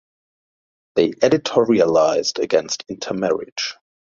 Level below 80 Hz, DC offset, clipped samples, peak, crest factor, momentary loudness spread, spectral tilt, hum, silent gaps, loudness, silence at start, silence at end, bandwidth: -60 dBFS; under 0.1%; under 0.1%; -2 dBFS; 18 dB; 10 LU; -4 dB/octave; none; 3.52-3.56 s; -19 LUFS; 0.95 s; 0.4 s; 7.6 kHz